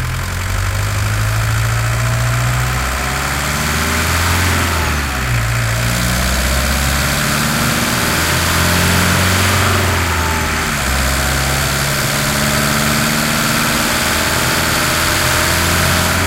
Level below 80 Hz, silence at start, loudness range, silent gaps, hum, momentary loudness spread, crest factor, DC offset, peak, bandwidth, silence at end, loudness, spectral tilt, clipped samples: -24 dBFS; 0 s; 3 LU; none; none; 4 LU; 14 dB; under 0.1%; -2 dBFS; 16 kHz; 0 s; -14 LUFS; -3.5 dB/octave; under 0.1%